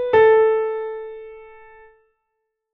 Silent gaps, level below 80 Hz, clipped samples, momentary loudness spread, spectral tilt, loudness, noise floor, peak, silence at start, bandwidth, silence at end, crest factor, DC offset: none; -58 dBFS; under 0.1%; 24 LU; -2 dB/octave; -17 LUFS; -77 dBFS; -4 dBFS; 0 s; 3.8 kHz; 1.3 s; 16 dB; under 0.1%